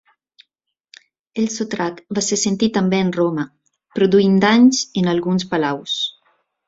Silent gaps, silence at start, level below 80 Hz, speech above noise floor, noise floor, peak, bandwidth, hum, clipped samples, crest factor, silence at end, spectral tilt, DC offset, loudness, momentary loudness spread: none; 1.35 s; -58 dBFS; 59 dB; -76 dBFS; -2 dBFS; 7.8 kHz; none; under 0.1%; 16 dB; 0.6 s; -4.5 dB/octave; under 0.1%; -18 LUFS; 11 LU